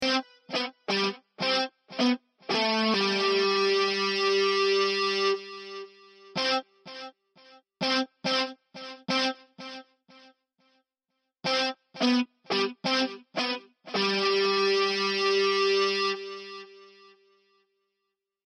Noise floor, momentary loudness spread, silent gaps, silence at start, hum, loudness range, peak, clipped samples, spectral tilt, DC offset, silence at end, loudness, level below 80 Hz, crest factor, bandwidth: -83 dBFS; 18 LU; none; 0 s; none; 7 LU; -12 dBFS; under 0.1%; -3.5 dB/octave; under 0.1%; 1.65 s; -26 LUFS; -80 dBFS; 18 dB; 10.5 kHz